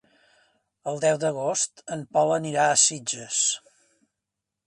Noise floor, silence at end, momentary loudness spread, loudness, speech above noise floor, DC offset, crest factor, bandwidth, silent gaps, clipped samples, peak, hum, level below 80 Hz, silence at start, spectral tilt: -85 dBFS; 1.1 s; 15 LU; -23 LUFS; 61 dB; under 0.1%; 20 dB; 11.5 kHz; none; under 0.1%; -6 dBFS; none; -72 dBFS; 0.85 s; -2 dB/octave